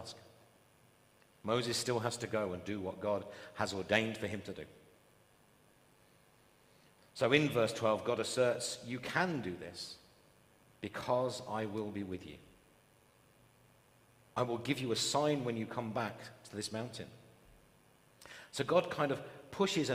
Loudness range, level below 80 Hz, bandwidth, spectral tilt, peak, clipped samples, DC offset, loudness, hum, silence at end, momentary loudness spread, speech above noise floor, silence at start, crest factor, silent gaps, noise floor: 7 LU; -74 dBFS; 15.5 kHz; -4.5 dB/octave; -12 dBFS; under 0.1%; under 0.1%; -36 LUFS; none; 0 s; 16 LU; 31 dB; 0 s; 26 dB; none; -67 dBFS